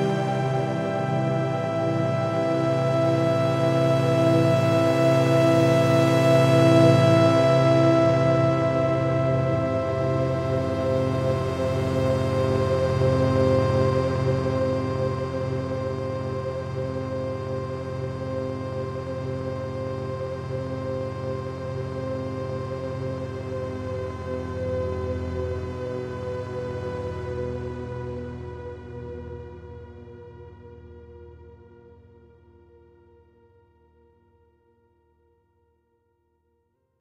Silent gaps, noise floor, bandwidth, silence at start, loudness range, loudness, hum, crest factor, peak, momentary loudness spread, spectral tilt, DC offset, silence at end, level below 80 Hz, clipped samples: none; -71 dBFS; 12.5 kHz; 0 s; 14 LU; -24 LUFS; none; 18 dB; -6 dBFS; 13 LU; -7.5 dB/octave; under 0.1%; 5.45 s; -48 dBFS; under 0.1%